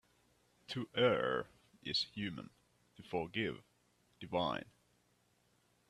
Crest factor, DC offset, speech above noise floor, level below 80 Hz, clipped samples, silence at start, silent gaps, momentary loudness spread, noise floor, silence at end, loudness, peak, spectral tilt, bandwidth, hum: 22 dB; under 0.1%; 37 dB; -74 dBFS; under 0.1%; 0.7 s; none; 20 LU; -75 dBFS; 1.25 s; -38 LUFS; -18 dBFS; -5.5 dB/octave; 12.5 kHz; 60 Hz at -65 dBFS